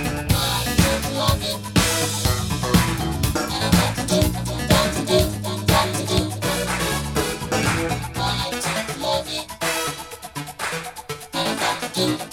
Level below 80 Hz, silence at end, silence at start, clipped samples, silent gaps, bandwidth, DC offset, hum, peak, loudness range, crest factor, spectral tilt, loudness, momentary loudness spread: -34 dBFS; 0 s; 0 s; under 0.1%; none; 18.5 kHz; under 0.1%; none; -2 dBFS; 5 LU; 20 dB; -4 dB/octave; -21 LUFS; 8 LU